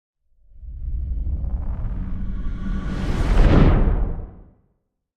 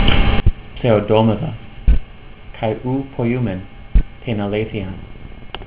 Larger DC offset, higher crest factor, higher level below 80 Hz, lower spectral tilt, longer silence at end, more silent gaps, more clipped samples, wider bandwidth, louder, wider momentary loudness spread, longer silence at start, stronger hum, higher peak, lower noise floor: neither; about the same, 18 dB vs 16 dB; about the same, -22 dBFS vs -22 dBFS; second, -8.5 dB/octave vs -11 dB/octave; first, 0.75 s vs 0 s; neither; neither; first, 6.8 kHz vs 4 kHz; second, -23 LUFS vs -20 LUFS; about the same, 17 LU vs 15 LU; first, 0.55 s vs 0 s; neither; about the same, -2 dBFS vs 0 dBFS; first, -70 dBFS vs -36 dBFS